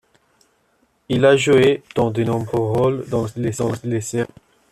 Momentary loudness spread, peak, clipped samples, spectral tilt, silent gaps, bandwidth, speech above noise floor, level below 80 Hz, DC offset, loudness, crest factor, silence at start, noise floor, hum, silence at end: 10 LU; -2 dBFS; under 0.1%; -6 dB/octave; none; 13.5 kHz; 45 dB; -52 dBFS; under 0.1%; -19 LUFS; 16 dB; 1.1 s; -63 dBFS; none; 0.45 s